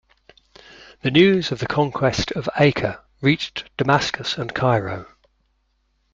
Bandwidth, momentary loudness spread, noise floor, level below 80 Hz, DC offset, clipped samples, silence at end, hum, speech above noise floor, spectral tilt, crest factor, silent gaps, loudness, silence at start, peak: 7.6 kHz; 11 LU; -67 dBFS; -50 dBFS; under 0.1%; under 0.1%; 1.1 s; none; 47 dB; -5.5 dB/octave; 20 dB; none; -20 LUFS; 1.05 s; -2 dBFS